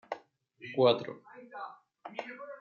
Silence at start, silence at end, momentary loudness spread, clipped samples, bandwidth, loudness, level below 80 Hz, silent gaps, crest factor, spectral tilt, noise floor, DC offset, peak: 0.1 s; 0 s; 22 LU; under 0.1%; 7 kHz; -31 LUFS; -82 dBFS; none; 22 dB; -3.5 dB/octave; -58 dBFS; under 0.1%; -12 dBFS